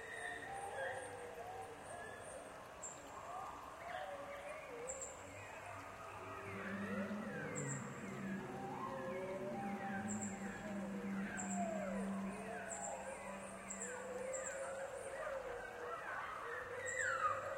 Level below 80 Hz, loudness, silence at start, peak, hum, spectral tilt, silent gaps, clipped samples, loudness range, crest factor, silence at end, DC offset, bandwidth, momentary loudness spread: -72 dBFS; -46 LUFS; 0 s; -28 dBFS; none; -4.5 dB/octave; none; under 0.1%; 5 LU; 18 dB; 0 s; under 0.1%; 16.5 kHz; 8 LU